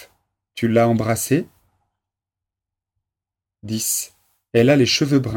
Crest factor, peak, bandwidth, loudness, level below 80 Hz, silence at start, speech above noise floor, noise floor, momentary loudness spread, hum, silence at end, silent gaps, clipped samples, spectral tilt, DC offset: 18 dB; -2 dBFS; 17.5 kHz; -18 LUFS; -56 dBFS; 0 s; 70 dB; -87 dBFS; 15 LU; none; 0 s; none; under 0.1%; -4.5 dB/octave; under 0.1%